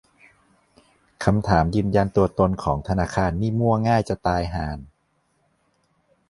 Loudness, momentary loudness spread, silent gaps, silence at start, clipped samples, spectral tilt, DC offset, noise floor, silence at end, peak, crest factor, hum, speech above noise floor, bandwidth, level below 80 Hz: -22 LUFS; 7 LU; none; 1.2 s; under 0.1%; -7.5 dB/octave; under 0.1%; -68 dBFS; 1.45 s; -2 dBFS; 22 dB; none; 47 dB; 11.5 kHz; -38 dBFS